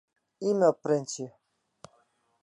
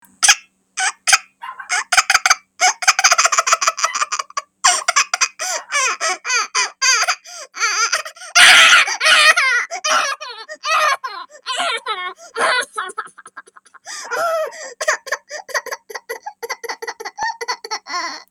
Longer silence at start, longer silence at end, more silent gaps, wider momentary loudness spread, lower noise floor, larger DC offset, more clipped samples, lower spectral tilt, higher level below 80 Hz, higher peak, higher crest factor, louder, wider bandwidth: first, 0.4 s vs 0.2 s; first, 1.15 s vs 0.1 s; neither; second, 14 LU vs 18 LU; first, -69 dBFS vs -43 dBFS; neither; neither; first, -5.5 dB/octave vs 3.5 dB/octave; second, -80 dBFS vs -64 dBFS; second, -10 dBFS vs 0 dBFS; about the same, 20 dB vs 18 dB; second, -28 LUFS vs -15 LUFS; second, 11.5 kHz vs over 20 kHz